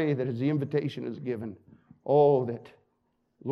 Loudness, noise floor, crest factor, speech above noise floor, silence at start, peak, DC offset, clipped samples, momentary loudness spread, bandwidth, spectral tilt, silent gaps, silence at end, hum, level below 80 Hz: -28 LUFS; -74 dBFS; 18 dB; 47 dB; 0 s; -12 dBFS; under 0.1%; under 0.1%; 19 LU; 6.2 kHz; -9.5 dB/octave; none; 0 s; none; -76 dBFS